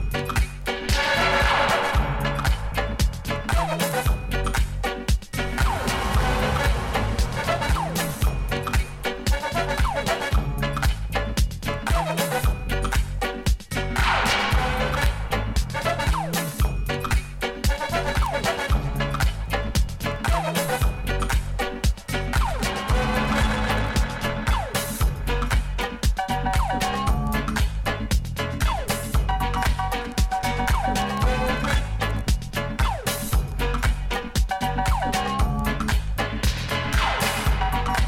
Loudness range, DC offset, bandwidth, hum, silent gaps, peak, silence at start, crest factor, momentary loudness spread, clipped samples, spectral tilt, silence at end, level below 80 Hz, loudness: 2 LU; under 0.1%; 16.5 kHz; none; none; -6 dBFS; 0 s; 18 dB; 4 LU; under 0.1%; -4.5 dB/octave; 0 s; -26 dBFS; -24 LUFS